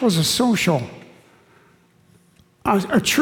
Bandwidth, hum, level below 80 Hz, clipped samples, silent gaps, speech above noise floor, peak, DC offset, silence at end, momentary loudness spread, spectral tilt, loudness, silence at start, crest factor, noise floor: 18 kHz; none; -54 dBFS; under 0.1%; none; 37 dB; -6 dBFS; under 0.1%; 0 s; 9 LU; -4 dB/octave; -19 LUFS; 0 s; 16 dB; -55 dBFS